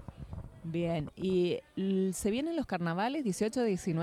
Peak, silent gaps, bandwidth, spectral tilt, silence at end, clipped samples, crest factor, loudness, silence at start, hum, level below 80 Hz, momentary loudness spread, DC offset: -18 dBFS; none; 15 kHz; -6 dB/octave; 0 s; under 0.1%; 14 dB; -33 LUFS; 0 s; none; -56 dBFS; 10 LU; under 0.1%